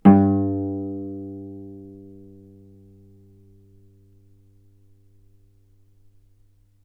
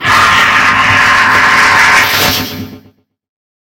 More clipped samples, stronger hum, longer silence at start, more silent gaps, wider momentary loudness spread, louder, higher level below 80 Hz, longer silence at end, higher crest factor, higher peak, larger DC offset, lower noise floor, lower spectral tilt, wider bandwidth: second, under 0.1% vs 0.5%; neither; about the same, 0.05 s vs 0 s; neither; first, 29 LU vs 8 LU; second, -23 LUFS vs -6 LUFS; second, -60 dBFS vs -38 dBFS; first, 4.85 s vs 0.85 s; first, 26 dB vs 10 dB; about the same, 0 dBFS vs 0 dBFS; neither; first, -57 dBFS vs -46 dBFS; first, -12 dB/octave vs -2 dB/octave; second, 3.2 kHz vs 17.5 kHz